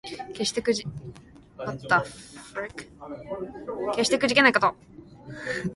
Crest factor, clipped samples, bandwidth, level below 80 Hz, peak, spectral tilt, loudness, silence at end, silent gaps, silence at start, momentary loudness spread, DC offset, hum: 24 dB; under 0.1%; 11.5 kHz; -58 dBFS; -4 dBFS; -3.5 dB/octave; -25 LUFS; 0 s; none; 0.05 s; 22 LU; under 0.1%; none